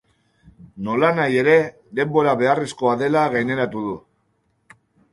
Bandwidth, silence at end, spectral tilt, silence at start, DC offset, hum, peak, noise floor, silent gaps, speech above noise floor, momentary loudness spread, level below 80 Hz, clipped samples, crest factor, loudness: 11.5 kHz; 1.15 s; -6.5 dB/octave; 0.75 s; under 0.1%; none; -2 dBFS; -67 dBFS; none; 48 dB; 11 LU; -60 dBFS; under 0.1%; 18 dB; -19 LUFS